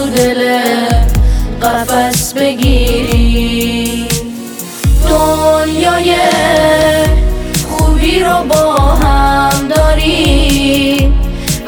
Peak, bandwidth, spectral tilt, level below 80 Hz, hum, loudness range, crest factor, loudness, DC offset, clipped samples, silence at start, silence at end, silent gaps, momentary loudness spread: 0 dBFS; over 20 kHz; -4.5 dB/octave; -14 dBFS; none; 3 LU; 10 dB; -11 LUFS; under 0.1%; under 0.1%; 0 s; 0 s; none; 6 LU